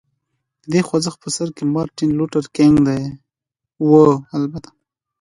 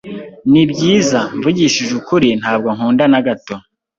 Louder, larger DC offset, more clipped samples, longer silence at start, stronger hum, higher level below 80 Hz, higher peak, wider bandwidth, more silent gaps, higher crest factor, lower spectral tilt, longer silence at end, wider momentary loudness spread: second, -17 LUFS vs -14 LUFS; neither; neither; first, 0.7 s vs 0.05 s; neither; about the same, -50 dBFS vs -50 dBFS; about the same, 0 dBFS vs -2 dBFS; first, 11.5 kHz vs 7.8 kHz; neither; first, 18 dB vs 12 dB; first, -6.5 dB/octave vs -5 dB/octave; first, 0.6 s vs 0.4 s; about the same, 12 LU vs 11 LU